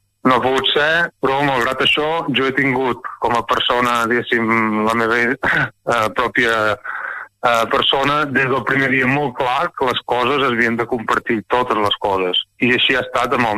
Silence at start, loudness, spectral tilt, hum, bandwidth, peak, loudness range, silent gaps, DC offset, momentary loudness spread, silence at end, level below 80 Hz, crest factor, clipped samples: 0.25 s; -16 LUFS; -4.5 dB/octave; none; 14 kHz; -2 dBFS; 1 LU; none; under 0.1%; 4 LU; 0 s; -48 dBFS; 16 dB; under 0.1%